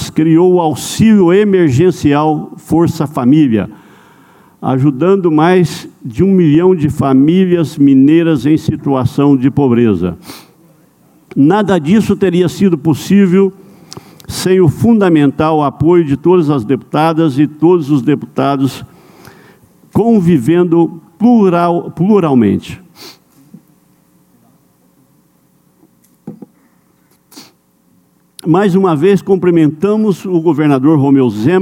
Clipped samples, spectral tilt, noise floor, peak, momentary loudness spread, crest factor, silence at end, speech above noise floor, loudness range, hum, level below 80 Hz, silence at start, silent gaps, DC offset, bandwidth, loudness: under 0.1%; -7.5 dB/octave; -52 dBFS; 0 dBFS; 7 LU; 12 dB; 0 s; 43 dB; 4 LU; none; -44 dBFS; 0 s; none; under 0.1%; 16.5 kHz; -11 LUFS